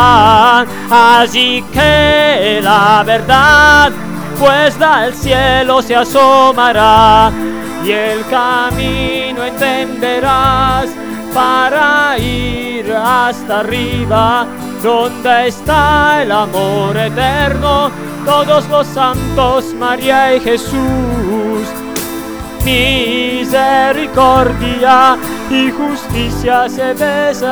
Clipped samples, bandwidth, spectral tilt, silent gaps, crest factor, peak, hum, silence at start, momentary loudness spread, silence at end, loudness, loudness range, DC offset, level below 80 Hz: 0.8%; over 20 kHz; -4.5 dB/octave; none; 10 dB; 0 dBFS; none; 0 s; 10 LU; 0 s; -10 LUFS; 5 LU; under 0.1%; -28 dBFS